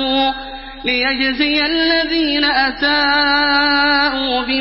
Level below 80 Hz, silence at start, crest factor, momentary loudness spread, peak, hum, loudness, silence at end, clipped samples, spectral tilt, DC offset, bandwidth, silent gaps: -40 dBFS; 0 s; 14 dB; 6 LU; -2 dBFS; none; -14 LUFS; 0 s; under 0.1%; -7 dB/octave; under 0.1%; 5.8 kHz; none